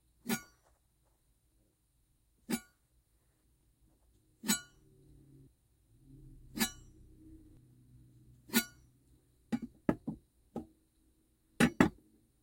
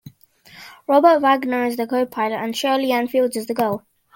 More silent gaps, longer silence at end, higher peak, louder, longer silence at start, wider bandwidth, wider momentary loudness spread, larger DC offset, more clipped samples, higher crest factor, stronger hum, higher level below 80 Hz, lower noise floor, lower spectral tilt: neither; first, 0.55 s vs 0.4 s; second, -8 dBFS vs -2 dBFS; second, -36 LUFS vs -19 LUFS; first, 0.25 s vs 0.05 s; about the same, 16.5 kHz vs 17 kHz; first, 23 LU vs 9 LU; neither; neither; first, 32 dB vs 18 dB; neither; first, -62 dBFS vs -68 dBFS; first, -74 dBFS vs -49 dBFS; about the same, -4 dB/octave vs -4.5 dB/octave